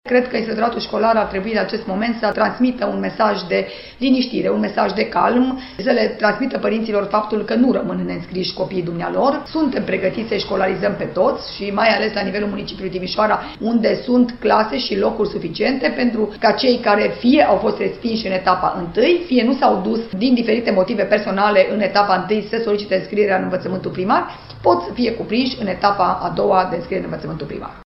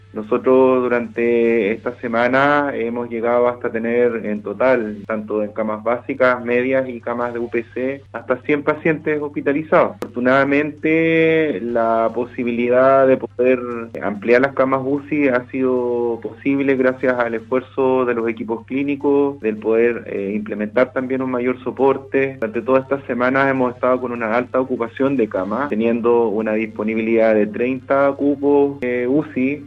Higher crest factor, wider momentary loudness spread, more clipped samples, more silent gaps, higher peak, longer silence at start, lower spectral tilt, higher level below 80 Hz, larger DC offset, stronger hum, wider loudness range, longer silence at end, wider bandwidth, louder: about the same, 18 dB vs 16 dB; about the same, 7 LU vs 8 LU; neither; neither; about the same, 0 dBFS vs -2 dBFS; about the same, 0.05 s vs 0.15 s; about the same, -8.5 dB/octave vs -8.5 dB/octave; first, -46 dBFS vs -58 dBFS; neither; neither; about the same, 3 LU vs 3 LU; about the same, 0.05 s vs 0 s; second, 5.8 kHz vs 6.8 kHz; about the same, -18 LUFS vs -18 LUFS